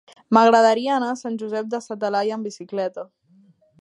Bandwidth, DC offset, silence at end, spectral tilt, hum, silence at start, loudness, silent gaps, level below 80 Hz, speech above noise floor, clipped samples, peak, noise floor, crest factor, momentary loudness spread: 11 kHz; under 0.1%; 0.75 s; -5 dB/octave; none; 0.3 s; -21 LUFS; none; -78 dBFS; 36 dB; under 0.1%; 0 dBFS; -56 dBFS; 20 dB; 15 LU